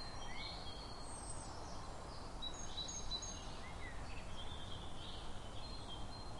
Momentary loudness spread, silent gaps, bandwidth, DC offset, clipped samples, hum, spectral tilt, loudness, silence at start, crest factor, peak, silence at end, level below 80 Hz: 7 LU; none; 11.5 kHz; under 0.1%; under 0.1%; none; -3 dB/octave; -48 LUFS; 0 s; 12 dB; -34 dBFS; 0 s; -52 dBFS